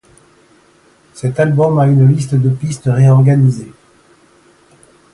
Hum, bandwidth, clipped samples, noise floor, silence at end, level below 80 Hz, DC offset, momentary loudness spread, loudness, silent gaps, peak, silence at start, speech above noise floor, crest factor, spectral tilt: none; 11 kHz; under 0.1%; -49 dBFS; 1.45 s; -50 dBFS; under 0.1%; 10 LU; -12 LUFS; none; 0 dBFS; 1.15 s; 39 dB; 14 dB; -8.5 dB/octave